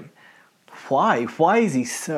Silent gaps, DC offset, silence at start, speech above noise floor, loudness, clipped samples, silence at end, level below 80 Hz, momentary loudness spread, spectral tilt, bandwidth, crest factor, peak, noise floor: none; under 0.1%; 0 s; 33 dB; -20 LUFS; under 0.1%; 0 s; -80 dBFS; 6 LU; -5 dB/octave; 15 kHz; 16 dB; -6 dBFS; -53 dBFS